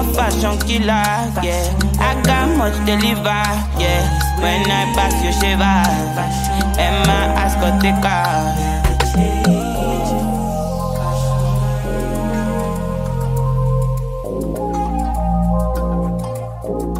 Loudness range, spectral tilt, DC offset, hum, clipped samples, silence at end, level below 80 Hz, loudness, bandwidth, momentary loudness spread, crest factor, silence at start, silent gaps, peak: 4 LU; -5 dB/octave; under 0.1%; none; under 0.1%; 0 s; -22 dBFS; -17 LUFS; 16 kHz; 6 LU; 16 dB; 0 s; none; 0 dBFS